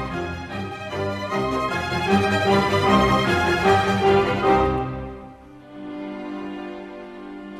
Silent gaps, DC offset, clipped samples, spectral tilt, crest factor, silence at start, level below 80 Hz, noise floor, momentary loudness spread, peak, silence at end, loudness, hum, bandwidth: none; under 0.1%; under 0.1%; -6 dB/octave; 18 dB; 0 s; -40 dBFS; -43 dBFS; 18 LU; -4 dBFS; 0 s; -21 LUFS; none; 14.5 kHz